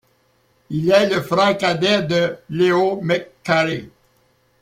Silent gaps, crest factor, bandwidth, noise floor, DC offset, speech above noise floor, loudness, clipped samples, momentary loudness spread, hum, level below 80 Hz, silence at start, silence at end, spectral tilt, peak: none; 18 dB; 16 kHz; -61 dBFS; under 0.1%; 43 dB; -18 LUFS; under 0.1%; 7 LU; none; -58 dBFS; 0.7 s; 0.75 s; -5.5 dB/octave; -2 dBFS